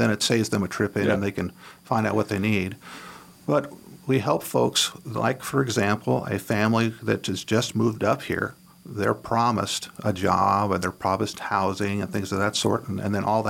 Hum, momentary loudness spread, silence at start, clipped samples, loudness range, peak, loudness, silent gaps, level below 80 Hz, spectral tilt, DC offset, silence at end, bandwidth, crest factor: none; 7 LU; 0 s; under 0.1%; 2 LU; -6 dBFS; -25 LUFS; none; -58 dBFS; -5 dB/octave; under 0.1%; 0 s; 17 kHz; 18 dB